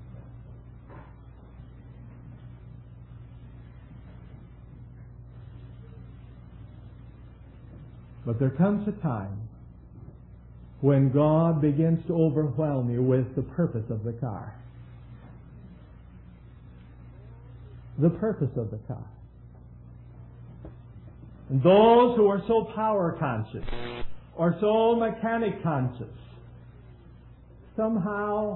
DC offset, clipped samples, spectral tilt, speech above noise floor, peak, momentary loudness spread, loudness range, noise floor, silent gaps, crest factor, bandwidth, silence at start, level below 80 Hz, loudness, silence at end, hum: under 0.1%; under 0.1%; -12 dB/octave; 25 dB; -8 dBFS; 26 LU; 24 LU; -50 dBFS; none; 22 dB; 4.2 kHz; 0 s; -48 dBFS; -25 LUFS; 0 s; none